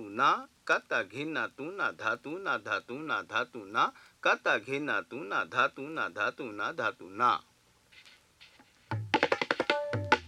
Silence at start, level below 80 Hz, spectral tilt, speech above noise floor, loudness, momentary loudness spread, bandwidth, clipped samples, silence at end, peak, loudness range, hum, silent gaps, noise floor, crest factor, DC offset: 0 s; -72 dBFS; -4.5 dB/octave; 29 dB; -31 LUFS; 7 LU; 13.5 kHz; under 0.1%; 0 s; -8 dBFS; 2 LU; none; none; -61 dBFS; 24 dB; under 0.1%